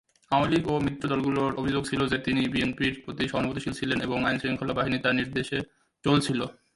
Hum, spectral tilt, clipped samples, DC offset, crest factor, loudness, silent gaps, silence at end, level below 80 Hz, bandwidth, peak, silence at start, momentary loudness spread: none; -5.5 dB/octave; under 0.1%; under 0.1%; 18 dB; -27 LUFS; none; 0.25 s; -52 dBFS; 11.5 kHz; -8 dBFS; 0.3 s; 6 LU